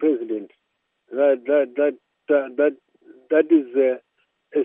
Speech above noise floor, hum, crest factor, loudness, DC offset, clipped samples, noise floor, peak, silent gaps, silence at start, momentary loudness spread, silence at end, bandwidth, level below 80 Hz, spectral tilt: 55 dB; none; 16 dB; -21 LUFS; under 0.1%; under 0.1%; -74 dBFS; -4 dBFS; none; 0 s; 13 LU; 0 s; 3.7 kHz; -88 dBFS; -4 dB/octave